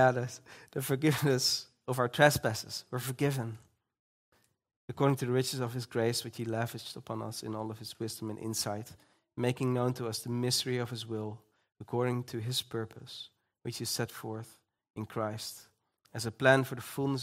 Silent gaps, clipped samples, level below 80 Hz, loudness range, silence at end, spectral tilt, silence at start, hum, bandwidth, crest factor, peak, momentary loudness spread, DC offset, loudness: 3.99-4.32 s, 4.76-4.88 s, 14.90-14.94 s; under 0.1%; -68 dBFS; 8 LU; 0 s; -4.5 dB/octave; 0 s; none; 16 kHz; 26 dB; -8 dBFS; 17 LU; under 0.1%; -33 LUFS